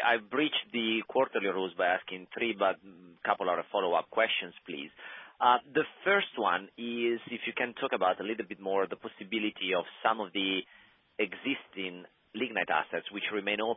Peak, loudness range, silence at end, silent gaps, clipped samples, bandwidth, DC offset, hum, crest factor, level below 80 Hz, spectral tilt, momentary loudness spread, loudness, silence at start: -10 dBFS; 3 LU; 0 s; none; under 0.1%; 3.9 kHz; under 0.1%; none; 22 dB; -80 dBFS; -7.5 dB/octave; 12 LU; -31 LUFS; 0 s